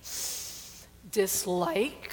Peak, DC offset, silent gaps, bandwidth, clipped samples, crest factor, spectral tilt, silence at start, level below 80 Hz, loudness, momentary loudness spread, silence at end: -14 dBFS; under 0.1%; none; 19 kHz; under 0.1%; 18 dB; -3 dB/octave; 0 s; -60 dBFS; -30 LUFS; 16 LU; 0 s